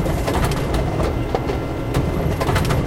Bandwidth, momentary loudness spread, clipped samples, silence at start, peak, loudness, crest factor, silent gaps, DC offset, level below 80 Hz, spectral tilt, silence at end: 17 kHz; 3 LU; under 0.1%; 0 s; -4 dBFS; -21 LUFS; 16 dB; none; under 0.1%; -26 dBFS; -6.5 dB/octave; 0 s